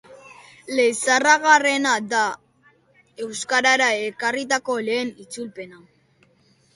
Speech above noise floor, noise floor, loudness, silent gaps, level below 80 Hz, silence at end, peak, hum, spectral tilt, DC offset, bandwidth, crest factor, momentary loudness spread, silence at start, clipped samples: 39 dB; -60 dBFS; -19 LUFS; none; -72 dBFS; 1 s; -2 dBFS; none; -1.5 dB/octave; under 0.1%; 11.5 kHz; 22 dB; 19 LU; 0.1 s; under 0.1%